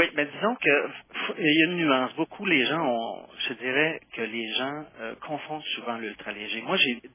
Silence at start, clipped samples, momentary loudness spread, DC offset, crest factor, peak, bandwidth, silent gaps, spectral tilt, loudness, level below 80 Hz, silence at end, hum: 0 s; under 0.1%; 13 LU; under 0.1%; 20 dB; -8 dBFS; 3.7 kHz; none; -1.5 dB/octave; -26 LUFS; -72 dBFS; 0.05 s; none